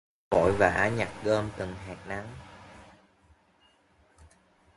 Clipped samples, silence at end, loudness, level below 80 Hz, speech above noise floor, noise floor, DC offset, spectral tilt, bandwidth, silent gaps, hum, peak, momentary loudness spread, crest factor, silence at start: under 0.1%; 1.95 s; -28 LUFS; -50 dBFS; 37 dB; -65 dBFS; under 0.1%; -6 dB/octave; 11.5 kHz; none; none; -6 dBFS; 24 LU; 26 dB; 0.3 s